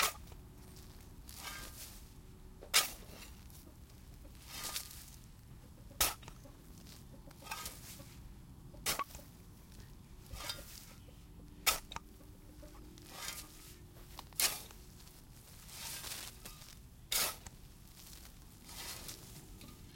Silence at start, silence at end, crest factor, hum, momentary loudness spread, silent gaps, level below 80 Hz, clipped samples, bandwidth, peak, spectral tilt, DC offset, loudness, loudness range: 0 s; 0 s; 30 dB; none; 23 LU; none; -58 dBFS; under 0.1%; 17 kHz; -14 dBFS; -1 dB/octave; under 0.1%; -39 LUFS; 6 LU